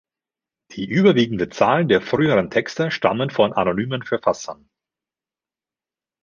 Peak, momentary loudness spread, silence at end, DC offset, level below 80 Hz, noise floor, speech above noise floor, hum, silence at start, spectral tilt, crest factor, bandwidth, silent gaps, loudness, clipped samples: -2 dBFS; 8 LU; 1.7 s; under 0.1%; -56 dBFS; under -90 dBFS; over 71 dB; none; 0.7 s; -6 dB/octave; 20 dB; 7.4 kHz; none; -19 LUFS; under 0.1%